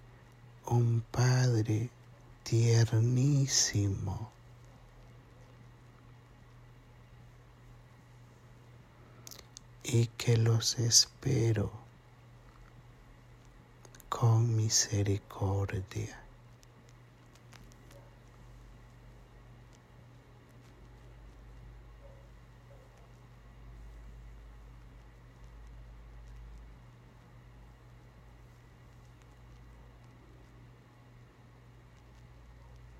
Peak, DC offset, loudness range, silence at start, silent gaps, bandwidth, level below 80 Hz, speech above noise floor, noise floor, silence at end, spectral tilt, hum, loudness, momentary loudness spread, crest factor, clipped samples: -10 dBFS; under 0.1%; 25 LU; 0.65 s; none; 14.5 kHz; -58 dBFS; 28 dB; -57 dBFS; 0.2 s; -4.5 dB/octave; none; -30 LUFS; 28 LU; 26 dB; under 0.1%